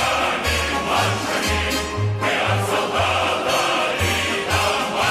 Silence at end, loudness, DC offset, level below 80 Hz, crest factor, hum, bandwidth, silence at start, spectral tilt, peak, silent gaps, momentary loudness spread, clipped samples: 0 s; -20 LUFS; under 0.1%; -36 dBFS; 14 dB; none; 15 kHz; 0 s; -3.5 dB/octave; -6 dBFS; none; 2 LU; under 0.1%